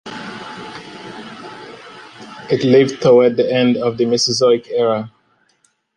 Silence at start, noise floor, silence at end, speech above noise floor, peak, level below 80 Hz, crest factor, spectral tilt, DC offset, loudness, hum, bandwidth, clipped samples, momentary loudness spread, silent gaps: 0.05 s; -61 dBFS; 0.9 s; 47 dB; -2 dBFS; -60 dBFS; 16 dB; -5 dB/octave; under 0.1%; -15 LUFS; none; 10.5 kHz; under 0.1%; 23 LU; none